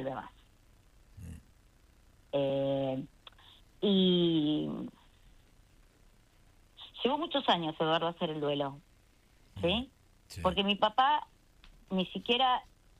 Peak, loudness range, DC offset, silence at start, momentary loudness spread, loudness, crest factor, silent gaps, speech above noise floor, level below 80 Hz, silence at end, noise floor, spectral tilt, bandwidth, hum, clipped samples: -12 dBFS; 5 LU; under 0.1%; 0 s; 22 LU; -31 LUFS; 20 dB; none; 33 dB; -60 dBFS; 0.35 s; -64 dBFS; -6.5 dB/octave; 12 kHz; none; under 0.1%